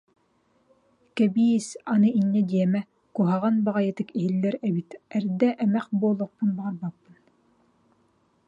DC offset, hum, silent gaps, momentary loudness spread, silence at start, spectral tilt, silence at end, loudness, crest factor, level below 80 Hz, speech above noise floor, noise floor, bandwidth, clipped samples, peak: under 0.1%; none; none; 10 LU; 1.15 s; -7.5 dB/octave; 1.55 s; -25 LUFS; 16 dB; -72 dBFS; 43 dB; -67 dBFS; 10.5 kHz; under 0.1%; -10 dBFS